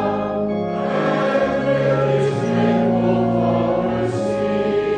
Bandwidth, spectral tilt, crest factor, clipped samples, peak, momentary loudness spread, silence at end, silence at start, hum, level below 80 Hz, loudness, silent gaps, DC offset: 9.4 kHz; -7.5 dB/octave; 12 dB; under 0.1%; -6 dBFS; 4 LU; 0 s; 0 s; none; -46 dBFS; -19 LUFS; none; under 0.1%